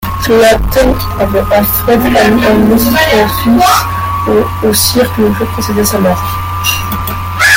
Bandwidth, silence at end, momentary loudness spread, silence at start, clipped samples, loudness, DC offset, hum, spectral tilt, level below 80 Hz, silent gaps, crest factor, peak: 17.5 kHz; 0 s; 7 LU; 0 s; under 0.1%; -9 LUFS; under 0.1%; none; -4.5 dB/octave; -24 dBFS; none; 10 dB; 0 dBFS